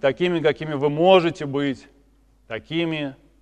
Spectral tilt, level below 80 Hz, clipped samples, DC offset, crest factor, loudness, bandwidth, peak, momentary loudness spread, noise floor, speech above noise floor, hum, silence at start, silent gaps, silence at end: -6.5 dB/octave; -56 dBFS; under 0.1%; under 0.1%; 20 dB; -21 LUFS; 9.4 kHz; -2 dBFS; 18 LU; -57 dBFS; 36 dB; none; 0.05 s; none; 0.3 s